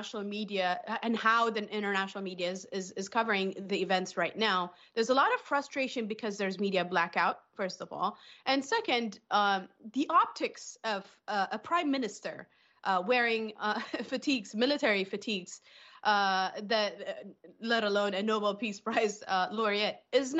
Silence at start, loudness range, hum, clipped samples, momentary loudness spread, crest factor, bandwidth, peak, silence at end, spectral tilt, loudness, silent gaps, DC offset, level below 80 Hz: 0 s; 2 LU; none; under 0.1%; 10 LU; 18 dB; 8.4 kHz; -14 dBFS; 0 s; -4 dB/octave; -31 LUFS; none; under 0.1%; -82 dBFS